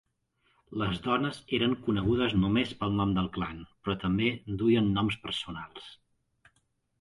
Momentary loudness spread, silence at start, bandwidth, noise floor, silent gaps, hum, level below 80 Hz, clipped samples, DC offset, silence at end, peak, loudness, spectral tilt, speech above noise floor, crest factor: 13 LU; 0.7 s; 11.5 kHz; -74 dBFS; none; none; -50 dBFS; under 0.1%; under 0.1%; 1.1 s; -14 dBFS; -29 LUFS; -7 dB/octave; 45 dB; 16 dB